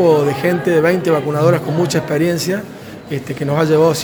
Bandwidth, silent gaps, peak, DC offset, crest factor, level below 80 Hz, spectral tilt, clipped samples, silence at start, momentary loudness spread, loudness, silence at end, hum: over 20 kHz; none; 0 dBFS; under 0.1%; 14 dB; -54 dBFS; -6 dB/octave; under 0.1%; 0 s; 12 LU; -16 LUFS; 0 s; none